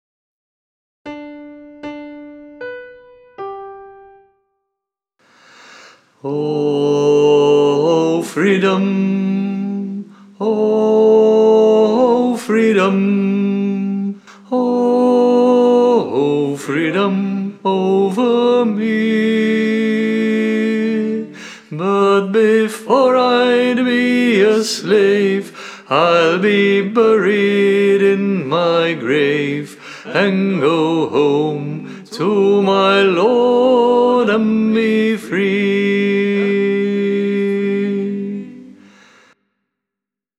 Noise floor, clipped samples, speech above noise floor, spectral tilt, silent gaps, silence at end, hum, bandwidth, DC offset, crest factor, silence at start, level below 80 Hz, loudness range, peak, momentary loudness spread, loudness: -84 dBFS; under 0.1%; 70 dB; -6 dB/octave; none; 1.65 s; none; 12.5 kHz; under 0.1%; 14 dB; 1.05 s; -72 dBFS; 9 LU; 0 dBFS; 17 LU; -14 LUFS